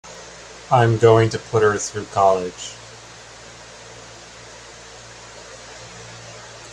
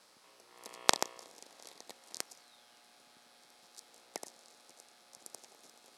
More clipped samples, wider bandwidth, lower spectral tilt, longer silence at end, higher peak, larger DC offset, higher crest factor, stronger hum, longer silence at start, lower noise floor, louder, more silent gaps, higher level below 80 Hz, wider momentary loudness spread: neither; second, 10.5 kHz vs 16 kHz; first, -5.5 dB/octave vs 0 dB/octave; second, 0 s vs 0.3 s; about the same, 0 dBFS vs 0 dBFS; neither; second, 22 dB vs 44 dB; neither; second, 0.05 s vs 0.6 s; second, -41 dBFS vs -63 dBFS; first, -18 LUFS vs -36 LUFS; neither; first, -52 dBFS vs -84 dBFS; second, 24 LU vs 29 LU